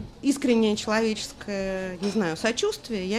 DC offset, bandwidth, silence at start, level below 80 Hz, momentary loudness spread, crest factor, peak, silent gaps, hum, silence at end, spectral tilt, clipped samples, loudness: under 0.1%; 14 kHz; 0 s; -52 dBFS; 9 LU; 16 dB; -10 dBFS; none; none; 0 s; -4.5 dB/octave; under 0.1%; -26 LUFS